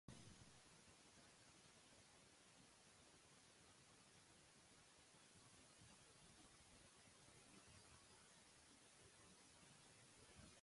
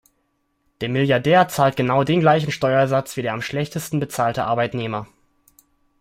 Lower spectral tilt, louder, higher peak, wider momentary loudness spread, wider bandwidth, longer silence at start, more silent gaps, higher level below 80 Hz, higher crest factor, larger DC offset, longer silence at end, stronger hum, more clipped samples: second, -2.5 dB/octave vs -6 dB/octave; second, -68 LUFS vs -20 LUFS; second, -44 dBFS vs -2 dBFS; second, 3 LU vs 10 LU; second, 11.5 kHz vs 16 kHz; second, 0.1 s vs 0.8 s; neither; second, -82 dBFS vs -56 dBFS; first, 24 dB vs 18 dB; neither; second, 0 s vs 0.95 s; neither; neither